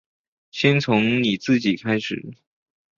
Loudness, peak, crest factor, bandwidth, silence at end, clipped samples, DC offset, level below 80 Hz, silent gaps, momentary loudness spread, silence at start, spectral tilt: -20 LUFS; -4 dBFS; 20 dB; 7.4 kHz; 0.65 s; under 0.1%; under 0.1%; -60 dBFS; none; 14 LU; 0.55 s; -6 dB/octave